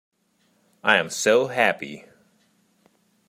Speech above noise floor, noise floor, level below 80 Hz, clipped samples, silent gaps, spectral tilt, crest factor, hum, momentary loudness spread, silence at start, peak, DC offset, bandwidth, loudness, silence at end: 45 dB; -66 dBFS; -74 dBFS; under 0.1%; none; -2.5 dB/octave; 24 dB; none; 16 LU; 0.85 s; -2 dBFS; under 0.1%; 16 kHz; -21 LUFS; 1.3 s